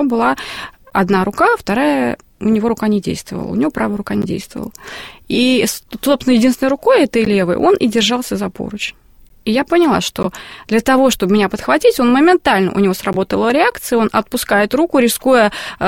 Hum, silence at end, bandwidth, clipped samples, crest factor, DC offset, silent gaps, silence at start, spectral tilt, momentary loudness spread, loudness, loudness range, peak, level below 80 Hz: none; 0 s; 17 kHz; under 0.1%; 14 dB; 0.3%; none; 0 s; -4.5 dB/octave; 11 LU; -15 LUFS; 5 LU; 0 dBFS; -44 dBFS